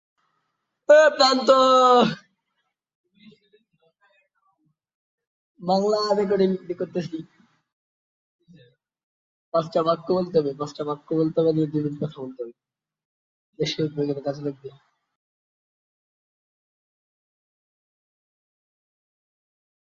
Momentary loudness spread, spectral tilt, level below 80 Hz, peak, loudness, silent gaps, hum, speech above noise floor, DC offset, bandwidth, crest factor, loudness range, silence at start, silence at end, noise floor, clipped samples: 19 LU; -5 dB/octave; -70 dBFS; -4 dBFS; -21 LUFS; 2.95-3.04 s, 4.94-5.18 s, 5.27-5.55 s, 7.73-8.39 s, 9.03-9.52 s, 13.05-13.53 s; none; 56 dB; under 0.1%; 7.8 kHz; 20 dB; 13 LU; 0.9 s; 5.3 s; -77 dBFS; under 0.1%